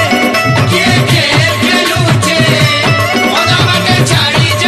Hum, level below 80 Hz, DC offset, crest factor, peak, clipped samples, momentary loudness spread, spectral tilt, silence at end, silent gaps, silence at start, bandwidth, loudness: none; -38 dBFS; under 0.1%; 8 dB; 0 dBFS; under 0.1%; 2 LU; -4 dB/octave; 0 s; none; 0 s; 14 kHz; -9 LUFS